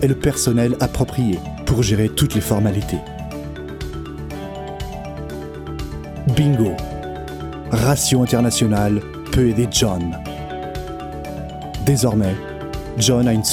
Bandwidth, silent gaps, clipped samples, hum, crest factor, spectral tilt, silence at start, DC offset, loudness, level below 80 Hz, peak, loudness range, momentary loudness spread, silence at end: 18 kHz; none; under 0.1%; none; 18 dB; -5 dB/octave; 0 s; under 0.1%; -20 LUFS; -34 dBFS; -2 dBFS; 7 LU; 14 LU; 0 s